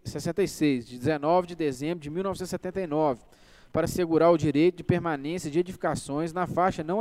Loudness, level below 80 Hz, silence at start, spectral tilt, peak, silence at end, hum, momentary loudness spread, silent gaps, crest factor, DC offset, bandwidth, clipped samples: -27 LUFS; -54 dBFS; 0.05 s; -6.5 dB/octave; -8 dBFS; 0 s; none; 9 LU; none; 18 dB; under 0.1%; 15.5 kHz; under 0.1%